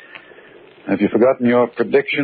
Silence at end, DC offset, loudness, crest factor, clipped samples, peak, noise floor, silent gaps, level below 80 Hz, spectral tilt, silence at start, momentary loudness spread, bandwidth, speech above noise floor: 0 s; under 0.1%; -16 LUFS; 14 dB; under 0.1%; -2 dBFS; -44 dBFS; none; -62 dBFS; -11 dB/octave; 0.85 s; 8 LU; 4.8 kHz; 28 dB